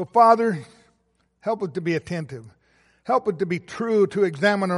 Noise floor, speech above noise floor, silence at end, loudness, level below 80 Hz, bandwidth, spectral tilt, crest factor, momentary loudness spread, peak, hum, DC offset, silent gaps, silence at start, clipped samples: -68 dBFS; 46 dB; 0 s; -22 LUFS; -64 dBFS; 11.5 kHz; -6.5 dB/octave; 20 dB; 16 LU; -4 dBFS; none; under 0.1%; none; 0 s; under 0.1%